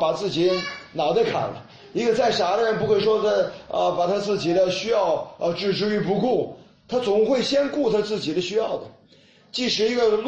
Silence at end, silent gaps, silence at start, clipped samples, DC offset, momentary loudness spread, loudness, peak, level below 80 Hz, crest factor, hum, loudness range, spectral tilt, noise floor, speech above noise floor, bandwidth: 0 s; none; 0 s; under 0.1%; under 0.1%; 7 LU; -22 LUFS; -10 dBFS; -58 dBFS; 14 dB; none; 2 LU; -5 dB/octave; -54 dBFS; 32 dB; 8.6 kHz